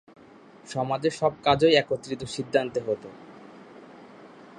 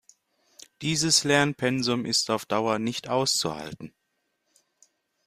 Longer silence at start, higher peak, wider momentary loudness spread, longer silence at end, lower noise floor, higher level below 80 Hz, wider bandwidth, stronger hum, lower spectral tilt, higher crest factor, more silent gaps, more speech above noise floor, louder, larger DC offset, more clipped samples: second, 0.65 s vs 0.8 s; about the same, -6 dBFS vs -6 dBFS; first, 26 LU vs 15 LU; second, 0.15 s vs 1.4 s; second, -51 dBFS vs -77 dBFS; about the same, -60 dBFS vs -64 dBFS; second, 11 kHz vs 15.5 kHz; neither; first, -5 dB/octave vs -3 dB/octave; about the same, 22 dB vs 20 dB; neither; second, 26 dB vs 51 dB; about the same, -25 LUFS vs -24 LUFS; neither; neither